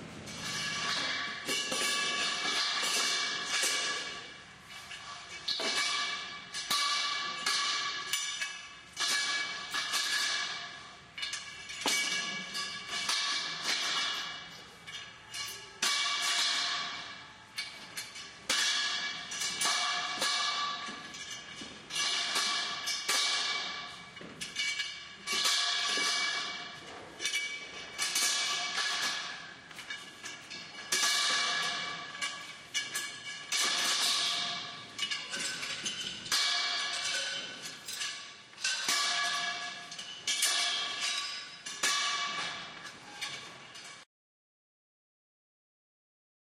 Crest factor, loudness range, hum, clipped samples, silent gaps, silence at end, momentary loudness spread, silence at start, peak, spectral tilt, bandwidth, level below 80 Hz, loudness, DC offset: 22 dB; 3 LU; none; under 0.1%; none; 2.4 s; 15 LU; 0 s; -14 dBFS; 1 dB/octave; 15.5 kHz; -74 dBFS; -31 LUFS; under 0.1%